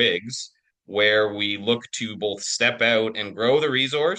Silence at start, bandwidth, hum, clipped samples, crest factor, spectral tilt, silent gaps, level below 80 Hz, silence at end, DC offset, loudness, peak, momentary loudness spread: 0 s; 10 kHz; none; under 0.1%; 18 dB; -3 dB/octave; none; -68 dBFS; 0 s; under 0.1%; -22 LUFS; -6 dBFS; 11 LU